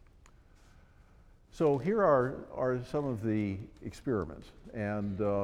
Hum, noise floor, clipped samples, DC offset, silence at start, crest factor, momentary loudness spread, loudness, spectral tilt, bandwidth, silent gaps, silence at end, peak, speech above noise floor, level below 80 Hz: none; -59 dBFS; under 0.1%; under 0.1%; 1.55 s; 20 dB; 15 LU; -32 LUFS; -8.5 dB/octave; 12 kHz; none; 0 s; -14 dBFS; 28 dB; -56 dBFS